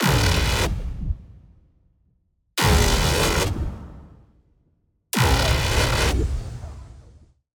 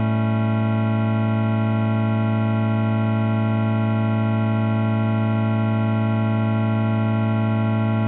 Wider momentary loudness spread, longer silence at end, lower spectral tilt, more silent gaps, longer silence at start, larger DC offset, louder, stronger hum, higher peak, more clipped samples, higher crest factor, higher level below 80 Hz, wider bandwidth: first, 18 LU vs 0 LU; first, 0.6 s vs 0 s; second, -4 dB/octave vs -8 dB/octave; neither; about the same, 0 s vs 0 s; neither; about the same, -21 LUFS vs -21 LUFS; neither; first, -6 dBFS vs -10 dBFS; neither; first, 18 dB vs 10 dB; first, -28 dBFS vs -60 dBFS; first, over 20 kHz vs 4 kHz